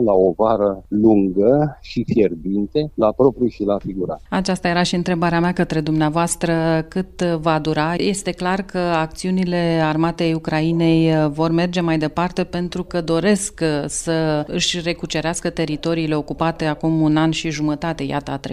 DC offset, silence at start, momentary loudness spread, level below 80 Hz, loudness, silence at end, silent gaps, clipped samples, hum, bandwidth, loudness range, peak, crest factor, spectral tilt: under 0.1%; 0 s; 7 LU; -42 dBFS; -19 LUFS; 0 s; none; under 0.1%; none; 13 kHz; 2 LU; -2 dBFS; 16 dB; -5.5 dB/octave